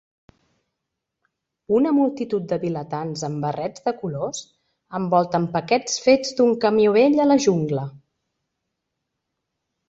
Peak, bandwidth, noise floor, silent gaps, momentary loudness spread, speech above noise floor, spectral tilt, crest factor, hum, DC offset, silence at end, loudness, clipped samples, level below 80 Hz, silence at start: -4 dBFS; 8 kHz; -81 dBFS; none; 12 LU; 61 dB; -5.5 dB/octave; 18 dB; none; under 0.1%; 1.9 s; -21 LUFS; under 0.1%; -62 dBFS; 1.7 s